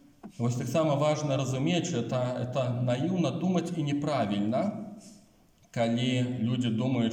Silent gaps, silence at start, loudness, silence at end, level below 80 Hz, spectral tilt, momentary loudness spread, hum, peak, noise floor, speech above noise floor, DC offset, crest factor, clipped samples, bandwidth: none; 0.25 s; -29 LUFS; 0 s; -68 dBFS; -6.5 dB/octave; 6 LU; none; -14 dBFS; -61 dBFS; 33 dB; under 0.1%; 14 dB; under 0.1%; 15.5 kHz